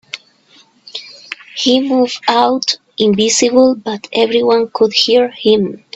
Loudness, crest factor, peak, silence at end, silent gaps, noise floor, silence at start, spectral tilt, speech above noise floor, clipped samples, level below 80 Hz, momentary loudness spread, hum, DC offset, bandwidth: -13 LUFS; 14 dB; 0 dBFS; 0.2 s; none; -49 dBFS; 0.15 s; -3.5 dB/octave; 36 dB; under 0.1%; -58 dBFS; 18 LU; none; under 0.1%; 8.4 kHz